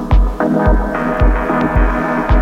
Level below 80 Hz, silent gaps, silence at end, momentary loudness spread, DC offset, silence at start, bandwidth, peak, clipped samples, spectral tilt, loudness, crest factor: -16 dBFS; none; 0 s; 2 LU; under 0.1%; 0 s; 5.8 kHz; -2 dBFS; under 0.1%; -8.5 dB/octave; -15 LUFS; 10 dB